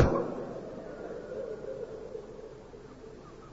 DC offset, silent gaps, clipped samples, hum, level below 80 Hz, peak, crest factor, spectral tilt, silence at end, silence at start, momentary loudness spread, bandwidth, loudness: under 0.1%; none; under 0.1%; none; -46 dBFS; -10 dBFS; 26 dB; -7.5 dB/octave; 0 s; 0 s; 14 LU; 7.6 kHz; -39 LUFS